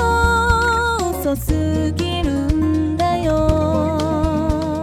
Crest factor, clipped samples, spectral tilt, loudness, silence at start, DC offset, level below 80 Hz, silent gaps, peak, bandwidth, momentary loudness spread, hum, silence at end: 16 dB; under 0.1%; -6 dB/octave; -18 LUFS; 0 s; under 0.1%; -26 dBFS; none; -2 dBFS; 16.5 kHz; 5 LU; none; 0 s